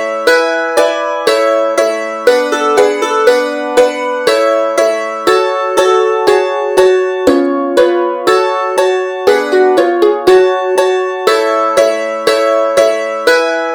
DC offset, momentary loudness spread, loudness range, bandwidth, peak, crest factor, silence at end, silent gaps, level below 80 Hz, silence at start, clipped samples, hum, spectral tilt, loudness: under 0.1%; 3 LU; 1 LU; 19 kHz; 0 dBFS; 10 dB; 0 s; none; -52 dBFS; 0 s; 0.2%; none; -2.5 dB/octave; -11 LUFS